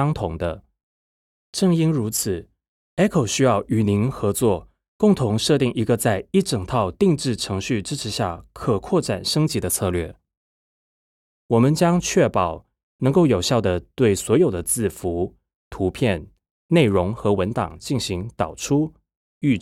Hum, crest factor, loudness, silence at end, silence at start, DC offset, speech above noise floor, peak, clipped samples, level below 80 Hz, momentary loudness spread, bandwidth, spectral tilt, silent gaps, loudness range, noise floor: none; 16 dB; -21 LUFS; 0 s; 0 s; under 0.1%; over 70 dB; -4 dBFS; under 0.1%; -46 dBFS; 9 LU; 16 kHz; -5.5 dB/octave; 0.83-1.53 s, 2.68-2.97 s, 4.88-4.99 s, 10.37-11.49 s, 12.83-12.99 s, 15.55-15.71 s, 16.50-16.69 s, 19.16-19.41 s; 3 LU; under -90 dBFS